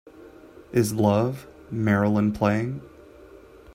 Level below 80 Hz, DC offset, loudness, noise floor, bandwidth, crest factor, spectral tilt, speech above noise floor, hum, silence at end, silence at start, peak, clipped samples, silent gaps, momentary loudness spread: -54 dBFS; under 0.1%; -24 LUFS; -48 dBFS; 16 kHz; 20 dB; -7 dB/octave; 25 dB; none; 0.05 s; 0.15 s; -6 dBFS; under 0.1%; none; 13 LU